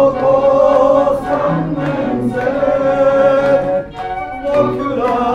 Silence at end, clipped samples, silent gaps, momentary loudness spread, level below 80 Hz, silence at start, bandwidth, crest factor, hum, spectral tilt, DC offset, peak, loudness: 0 s; under 0.1%; none; 8 LU; -40 dBFS; 0 s; 7.4 kHz; 12 dB; none; -7.5 dB/octave; under 0.1%; 0 dBFS; -14 LUFS